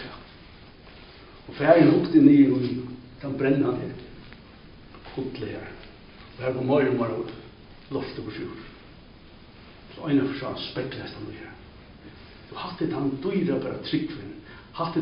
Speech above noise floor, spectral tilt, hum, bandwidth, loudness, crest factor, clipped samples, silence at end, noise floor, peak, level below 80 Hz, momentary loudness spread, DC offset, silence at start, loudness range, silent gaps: 25 dB; -6 dB/octave; none; 5.4 kHz; -24 LUFS; 22 dB; under 0.1%; 0 s; -48 dBFS; -4 dBFS; -54 dBFS; 27 LU; under 0.1%; 0 s; 11 LU; none